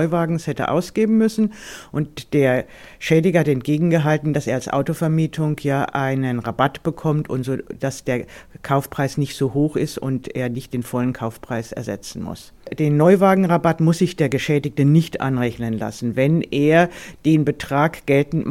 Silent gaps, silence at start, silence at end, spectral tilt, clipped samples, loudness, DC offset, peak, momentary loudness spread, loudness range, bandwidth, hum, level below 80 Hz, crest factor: none; 0 s; 0 s; -7 dB/octave; under 0.1%; -20 LUFS; under 0.1%; -2 dBFS; 11 LU; 6 LU; 15.5 kHz; none; -50 dBFS; 18 dB